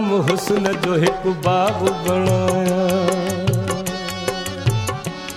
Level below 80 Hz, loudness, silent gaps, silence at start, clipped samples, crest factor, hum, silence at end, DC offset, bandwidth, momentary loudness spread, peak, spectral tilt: -44 dBFS; -19 LUFS; none; 0 s; under 0.1%; 16 dB; none; 0 s; under 0.1%; 16 kHz; 6 LU; -2 dBFS; -5.5 dB/octave